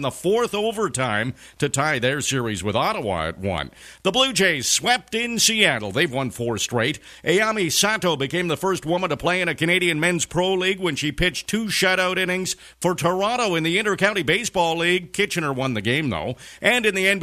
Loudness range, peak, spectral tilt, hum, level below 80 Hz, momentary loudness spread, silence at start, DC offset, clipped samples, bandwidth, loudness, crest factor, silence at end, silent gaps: 3 LU; 0 dBFS; -3 dB/octave; none; -48 dBFS; 7 LU; 0 s; under 0.1%; under 0.1%; 14 kHz; -21 LUFS; 22 dB; 0 s; none